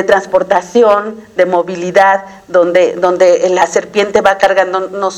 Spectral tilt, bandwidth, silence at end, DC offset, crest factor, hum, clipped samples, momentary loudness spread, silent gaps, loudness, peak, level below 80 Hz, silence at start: -4 dB/octave; 12 kHz; 0 s; under 0.1%; 10 dB; none; 0.5%; 6 LU; none; -11 LUFS; 0 dBFS; -52 dBFS; 0 s